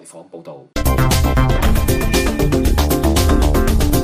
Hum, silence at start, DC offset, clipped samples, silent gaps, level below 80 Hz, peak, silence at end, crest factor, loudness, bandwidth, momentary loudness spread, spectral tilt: none; 0.05 s; under 0.1%; under 0.1%; none; -18 dBFS; -4 dBFS; 0 s; 12 dB; -16 LUFS; 15.5 kHz; 16 LU; -5.5 dB/octave